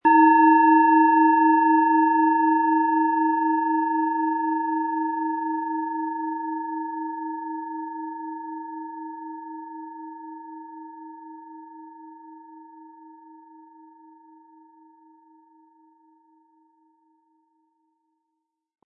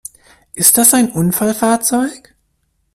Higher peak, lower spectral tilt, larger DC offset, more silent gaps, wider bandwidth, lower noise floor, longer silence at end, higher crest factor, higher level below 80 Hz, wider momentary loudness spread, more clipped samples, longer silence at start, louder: second, -6 dBFS vs 0 dBFS; first, -8.5 dB/octave vs -3.5 dB/octave; neither; neither; second, 2.9 kHz vs over 20 kHz; first, -81 dBFS vs -64 dBFS; first, 5.75 s vs 0.8 s; about the same, 18 dB vs 16 dB; second, -84 dBFS vs -52 dBFS; first, 25 LU vs 11 LU; second, under 0.1% vs 0.1%; second, 0.05 s vs 0.55 s; second, -21 LUFS vs -12 LUFS